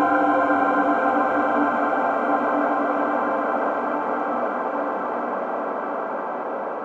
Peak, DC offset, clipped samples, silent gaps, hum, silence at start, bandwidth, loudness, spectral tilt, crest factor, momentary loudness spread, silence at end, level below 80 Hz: -8 dBFS; under 0.1%; under 0.1%; none; none; 0 s; 7.6 kHz; -22 LUFS; -7 dB/octave; 14 dB; 8 LU; 0 s; -70 dBFS